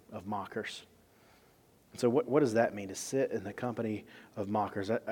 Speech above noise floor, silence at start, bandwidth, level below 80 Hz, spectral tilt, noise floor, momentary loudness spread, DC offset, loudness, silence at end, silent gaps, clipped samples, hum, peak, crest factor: 31 dB; 0.1 s; 18 kHz; -74 dBFS; -5.5 dB/octave; -64 dBFS; 14 LU; under 0.1%; -34 LUFS; 0 s; none; under 0.1%; none; -14 dBFS; 20 dB